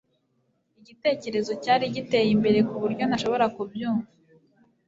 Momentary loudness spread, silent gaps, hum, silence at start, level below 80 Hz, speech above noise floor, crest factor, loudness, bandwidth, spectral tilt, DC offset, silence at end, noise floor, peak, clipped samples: 8 LU; none; none; 1.05 s; -64 dBFS; 47 dB; 18 dB; -25 LUFS; 7.8 kHz; -6 dB/octave; under 0.1%; 0.85 s; -71 dBFS; -8 dBFS; under 0.1%